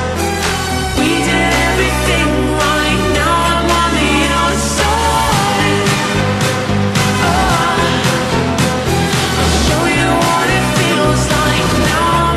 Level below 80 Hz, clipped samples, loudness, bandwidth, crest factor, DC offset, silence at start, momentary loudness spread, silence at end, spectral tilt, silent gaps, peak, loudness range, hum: -24 dBFS; under 0.1%; -13 LUFS; 13.5 kHz; 12 dB; under 0.1%; 0 s; 3 LU; 0 s; -4 dB/octave; none; 0 dBFS; 1 LU; none